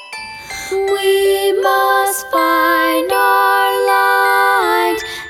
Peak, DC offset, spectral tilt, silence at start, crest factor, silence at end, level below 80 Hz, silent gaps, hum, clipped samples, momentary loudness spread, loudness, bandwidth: 0 dBFS; under 0.1%; -1.5 dB/octave; 0 s; 14 dB; 0 s; -52 dBFS; none; none; under 0.1%; 8 LU; -13 LUFS; 17.5 kHz